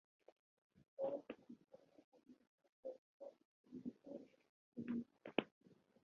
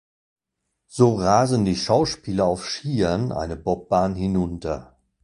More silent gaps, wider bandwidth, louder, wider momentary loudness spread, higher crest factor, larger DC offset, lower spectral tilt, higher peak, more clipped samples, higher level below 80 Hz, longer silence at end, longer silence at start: first, 0.88-0.97 s, 2.04-2.12 s, 2.47-2.58 s, 2.69-2.83 s, 2.98-3.20 s, 3.45-3.64 s, 4.49-4.72 s, 5.52-5.61 s vs none; second, 6.6 kHz vs 11.5 kHz; second, -50 LUFS vs -22 LUFS; first, 22 LU vs 9 LU; first, 34 dB vs 20 dB; neither; second, -4 dB/octave vs -6 dB/octave; second, -20 dBFS vs -2 dBFS; neither; second, under -90 dBFS vs -44 dBFS; about the same, 0.3 s vs 0.4 s; second, 0.75 s vs 0.9 s